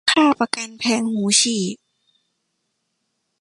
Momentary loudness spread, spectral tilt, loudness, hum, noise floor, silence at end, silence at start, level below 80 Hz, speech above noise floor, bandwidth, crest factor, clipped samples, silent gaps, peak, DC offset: 10 LU; -2.5 dB/octave; -18 LUFS; none; -74 dBFS; 1.65 s; 0.05 s; -66 dBFS; 55 dB; 11.5 kHz; 20 dB; under 0.1%; none; -2 dBFS; under 0.1%